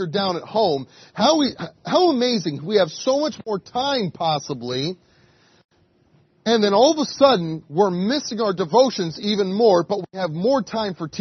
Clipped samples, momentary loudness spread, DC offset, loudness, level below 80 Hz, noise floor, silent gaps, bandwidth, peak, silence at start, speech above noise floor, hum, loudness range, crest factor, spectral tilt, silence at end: under 0.1%; 10 LU; under 0.1%; -20 LUFS; -64 dBFS; -59 dBFS; 5.64-5.69 s; 6.4 kHz; -2 dBFS; 0 s; 39 dB; none; 5 LU; 18 dB; -5 dB/octave; 0 s